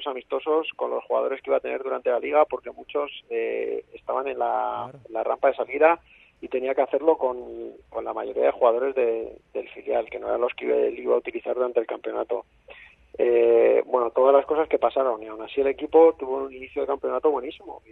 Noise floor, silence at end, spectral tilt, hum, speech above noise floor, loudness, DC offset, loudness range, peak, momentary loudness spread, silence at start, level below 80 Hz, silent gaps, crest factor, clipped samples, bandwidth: -49 dBFS; 0.15 s; -7 dB/octave; none; 25 dB; -24 LUFS; under 0.1%; 5 LU; -4 dBFS; 14 LU; 0 s; -62 dBFS; none; 20 dB; under 0.1%; 4 kHz